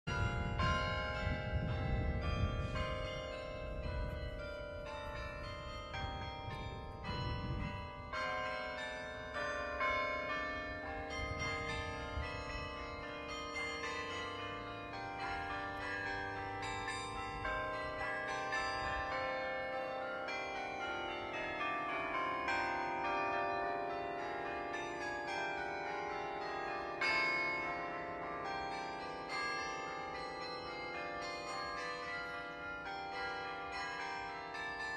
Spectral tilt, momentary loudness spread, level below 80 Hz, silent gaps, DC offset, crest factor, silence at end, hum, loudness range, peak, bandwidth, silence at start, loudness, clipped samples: -5 dB/octave; 8 LU; -52 dBFS; none; under 0.1%; 18 dB; 0 s; none; 5 LU; -22 dBFS; 12 kHz; 0.05 s; -40 LUFS; under 0.1%